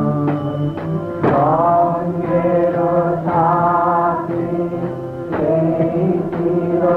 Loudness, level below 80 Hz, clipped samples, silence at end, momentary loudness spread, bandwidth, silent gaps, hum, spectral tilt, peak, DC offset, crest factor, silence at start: -17 LUFS; -48 dBFS; under 0.1%; 0 s; 8 LU; 5.4 kHz; none; none; -10.5 dB/octave; -4 dBFS; under 0.1%; 12 dB; 0 s